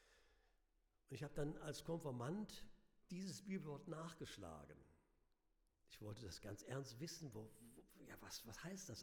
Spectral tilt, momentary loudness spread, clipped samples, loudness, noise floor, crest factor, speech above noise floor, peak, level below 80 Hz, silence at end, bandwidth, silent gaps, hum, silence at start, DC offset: -5 dB/octave; 13 LU; under 0.1%; -53 LUFS; -83 dBFS; 20 dB; 31 dB; -32 dBFS; -70 dBFS; 0 s; over 20 kHz; none; none; 0 s; under 0.1%